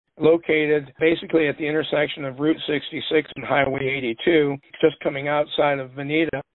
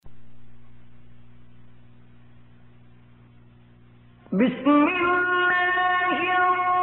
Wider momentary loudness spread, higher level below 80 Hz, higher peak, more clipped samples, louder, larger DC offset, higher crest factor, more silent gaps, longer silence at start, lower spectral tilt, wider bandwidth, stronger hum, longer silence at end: about the same, 5 LU vs 4 LU; about the same, -56 dBFS vs -60 dBFS; first, -4 dBFS vs -10 dBFS; neither; about the same, -22 LUFS vs -21 LUFS; neither; about the same, 18 dB vs 16 dB; neither; first, 0.2 s vs 0.05 s; first, -10.5 dB/octave vs -2.5 dB/octave; about the same, 4.1 kHz vs 4.2 kHz; second, none vs 60 Hz at -55 dBFS; first, 0.15 s vs 0 s